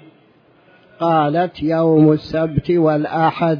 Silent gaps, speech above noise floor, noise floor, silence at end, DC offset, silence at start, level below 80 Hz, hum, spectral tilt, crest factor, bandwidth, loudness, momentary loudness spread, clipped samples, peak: none; 37 dB; -52 dBFS; 0 s; under 0.1%; 1 s; -46 dBFS; none; -9.5 dB/octave; 14 dB; 5.4 kHz; -16 LUFS; 7 LU; under 0.1%; -2 dBFS